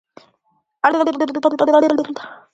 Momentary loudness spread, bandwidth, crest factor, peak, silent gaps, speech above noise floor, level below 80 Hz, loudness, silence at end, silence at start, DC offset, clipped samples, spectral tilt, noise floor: 10 LU; 8 kHz; 18 dB; 0 dBFS; none; 49 dB; -68 dBFS; -17 LUFS; 0.2 s; 0.85 s; under 0.1%; under 0.1%; -5 dB/octave; -66 dBFS